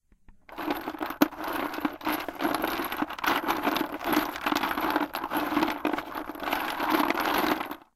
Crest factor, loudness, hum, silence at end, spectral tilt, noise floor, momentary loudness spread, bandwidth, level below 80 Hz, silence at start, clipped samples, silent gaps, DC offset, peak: 24 dB; -29 LUFS; none; 0.15 s; -3.5 dB/octave; -54 dBFS; 7 LU; 16.5 kHz; -56 dBFS; 0.3 s; under 0.1%; none; under 0.1%; -4 dBFS